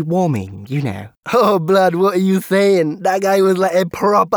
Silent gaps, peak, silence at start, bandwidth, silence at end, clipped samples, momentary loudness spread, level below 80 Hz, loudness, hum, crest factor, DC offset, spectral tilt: 1.17-1.23 s; -2 dBFS; 0 s; over 20 kHz; 0 s; under 0.1%; 9 LU; -56 dBFS; -15 LUFS; none; 12 dB; under 0.1%; -6.5 dB/octave